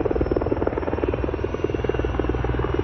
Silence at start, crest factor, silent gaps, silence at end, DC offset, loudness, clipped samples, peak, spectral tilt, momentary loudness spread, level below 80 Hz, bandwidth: 0 s; 16 dB; none; 0 s; under 0.1%; -24 LUFS; under 0.1%; -8 dBFS; -9 dB/octave; 3 LU; -30 dBFS; 6.2 kHz